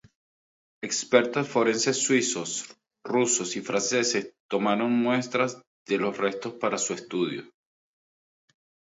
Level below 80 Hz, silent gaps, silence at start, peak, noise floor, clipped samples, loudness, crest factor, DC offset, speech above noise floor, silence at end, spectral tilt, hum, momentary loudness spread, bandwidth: -74 dBFS; 4.40-4.49 s, 5.67-5.86 s; 0.8 s; -4 dBFS; under -90 dBFS; under 0.1%; -26 LUFS; 22 dB; under 0.1%; over 64 dB; 1.5 s; -3 dB/octave; none; 9 LU; 8 kHz